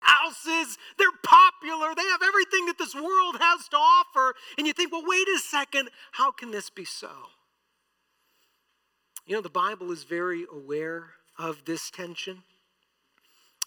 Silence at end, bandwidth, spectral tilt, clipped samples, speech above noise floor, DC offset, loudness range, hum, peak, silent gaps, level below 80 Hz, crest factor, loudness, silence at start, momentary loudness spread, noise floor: 0 s; 19 kHz; -1.5 dB/octave; under 0.1%; 48 dB; under 0.1%; 14 LU; none; -6 dBFS; none; -80 dBFS; 20 dB; -23 LUFS; 0 s; 17 LU; -75 dBFS